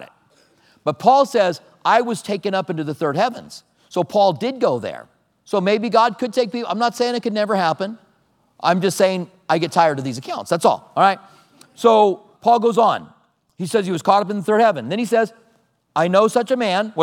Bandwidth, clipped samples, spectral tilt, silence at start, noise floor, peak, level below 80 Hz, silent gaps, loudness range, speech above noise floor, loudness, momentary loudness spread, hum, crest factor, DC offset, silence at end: 16.5 kHz; under 0.1%; -5 dB/octave; 0 s; -61 dBFS; 0 dBFS; -74 dBFS; none; 3 LU; 43 dB; -19 LUFS; 11 LU; none; 18 dB; under 0.1%; 0 s